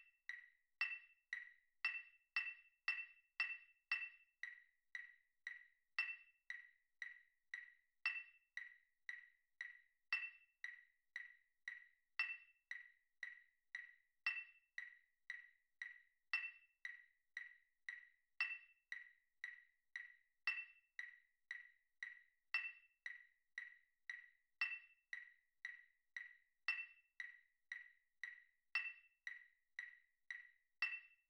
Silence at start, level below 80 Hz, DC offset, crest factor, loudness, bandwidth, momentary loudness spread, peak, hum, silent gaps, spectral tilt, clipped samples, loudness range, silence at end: 0 s; under -90 dBFS; under 0.1%; 26 dB; -50 LUFS; 11.5 kHz; 16 LU; -28 dBFS; none; none; 4.5 dB/octave; under 0.1%; 5 LU; 0.15 s